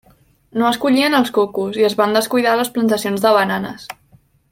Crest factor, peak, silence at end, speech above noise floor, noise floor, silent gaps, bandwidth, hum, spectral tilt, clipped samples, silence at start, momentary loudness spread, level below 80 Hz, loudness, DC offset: 16 dB; -2 dBFS; 0.6 s; 37 dB; -53 dBFS; none; 17 kHz; none; -4.5 dB/octave; under 0.1%; 0.55 s; 11 LU; -58 dBFS; -16 LUFS; under 0.1%